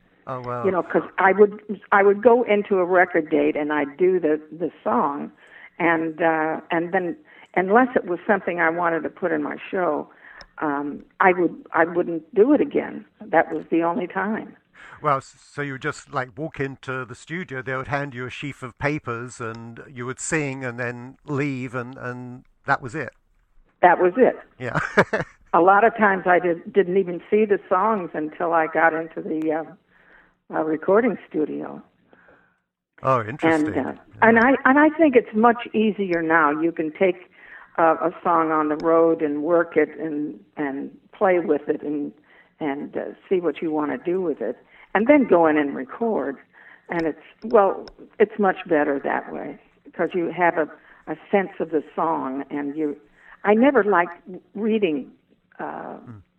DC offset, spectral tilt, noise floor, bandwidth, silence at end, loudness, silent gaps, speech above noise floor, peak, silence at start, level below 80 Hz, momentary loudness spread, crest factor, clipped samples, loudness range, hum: under 0.1%; -6.5 dB/octave; -70 dBFS; 9.8 kHz; 0.2 s; -22 LUFS; none; 49 dB; -2 dBFS; 0.25 s; -60 dBFS; 15 LU; 20 dB; under 0.1%; 9 LU; none